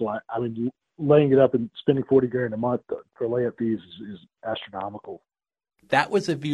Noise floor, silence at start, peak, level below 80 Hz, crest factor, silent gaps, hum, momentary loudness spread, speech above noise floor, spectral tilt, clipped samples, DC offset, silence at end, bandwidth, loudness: under -90 dBFS; 0 s; -4 dBFS; -62 dBFS; 20 dB; none; none; 18 LU; over 66 dB; -7 dB/octave; under 0.1%; under 0.1%; 0 s; 11.5 kHz; -24 LUFS